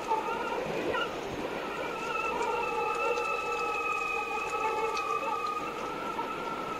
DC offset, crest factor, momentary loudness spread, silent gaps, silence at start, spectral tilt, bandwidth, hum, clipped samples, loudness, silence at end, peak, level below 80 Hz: under 0.1%; 14 dB; 5 LU; none; 0 s; -3.5 dB/octave; 16 kHz; none; under 0.1%; -32 LUFS; 0 s; -18 dBFS; -60 dBFS